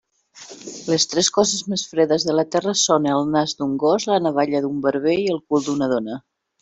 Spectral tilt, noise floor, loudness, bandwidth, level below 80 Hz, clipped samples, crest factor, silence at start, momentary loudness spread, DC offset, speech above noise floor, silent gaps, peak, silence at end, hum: -3.5 dB/octave; -44 dBFS; -20 LUFS; 8.4 kHz; -62 dBFS; under 0.1%; 18 dB; 0.35 s; 8 LU; under 0.1%; 24 dB; none; -2 dBFS; 0.4 s; none